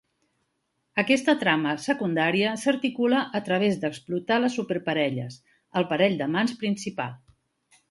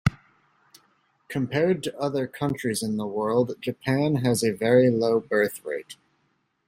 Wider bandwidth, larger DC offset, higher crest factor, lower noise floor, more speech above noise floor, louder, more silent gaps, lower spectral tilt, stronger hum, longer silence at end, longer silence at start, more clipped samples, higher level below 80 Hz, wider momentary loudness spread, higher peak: second, 11.5 kHz vs 16 kHz; neither; about the same, 20 dB vs 18 dB; first, -76 dBFS vs -71 dBFS; first, 51 dB vs 47 dB; about the same, -25 LUFS vs -25 LUFS; neither; about the same, -5 dB/octave vs -6 dB/octave; neither; about the same, 0.75 s vs 0.75 s; first, 0.95 s vs 0.05 s; neither; second, -70 dBFS vs -56 dBFS; about the same, 9 LU vs 11 LU; about the same, -6 dBFS vs -6 dBFS